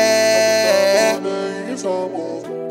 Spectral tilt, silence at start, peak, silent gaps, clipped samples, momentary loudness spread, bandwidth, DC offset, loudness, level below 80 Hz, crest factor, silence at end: -2.5 dB/octave; 0 s; -2 dBFS; none; under 0.1%; 12 LU; 16.5 kHz; under 0.1%; -17 LUFS; -74 dBFS; 16 dB; 0 s